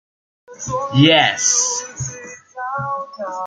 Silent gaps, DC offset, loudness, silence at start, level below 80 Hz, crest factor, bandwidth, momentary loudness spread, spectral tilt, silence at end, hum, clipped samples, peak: none; under 0.1%; -16 LUFS; 0.5 s; -54 dBFS; 18 dB; 10.5 kHz; 18 LU; -3 dB/octave; 0 s; none; under 0.1%; -2 dBFS